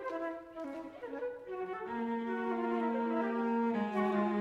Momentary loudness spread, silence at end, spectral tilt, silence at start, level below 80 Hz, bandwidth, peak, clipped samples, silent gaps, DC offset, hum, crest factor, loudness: 11 LU; 0 s; -8 dB/octave; 0 s; -74 dBFS; 7.2 kHz; -20 dBFS; under 0.1%; none; under 0.1%; none; 14 dB; -36 LUFS